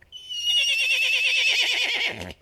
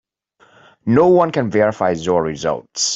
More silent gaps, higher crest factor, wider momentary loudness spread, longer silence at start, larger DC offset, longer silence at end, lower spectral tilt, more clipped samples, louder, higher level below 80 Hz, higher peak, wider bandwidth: neither; about the same, 14 dB vs 16 dB; about the same, 8 LU vs 10 LU; second, 0.1 s vs 0.85 s; neither; about the same, 0.1 s vs 0 s; second, 1 dB/octave vs -4.5 dB/octave; neither; second, -20 LUFS vs -16 LUFS; second, -60 dBFS vs -54 dBFS; second, -10 dBFS vs -2 dBFS; first, 15 kHz vs 8.2 kHz